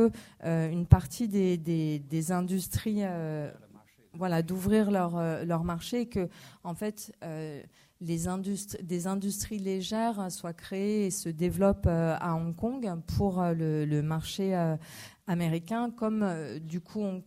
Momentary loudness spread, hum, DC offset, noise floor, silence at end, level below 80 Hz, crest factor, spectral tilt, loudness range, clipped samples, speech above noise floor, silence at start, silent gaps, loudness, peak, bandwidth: 12 LU; none; under 0.1%; -57 dBFS; 0.05 s; -48 dBFS; 26 dB; -6.5 dB/octave; 6 LU; under 0.1%; 27 dB; 0 s; none; -31 LUFS; -4 dBFS; 16 kHz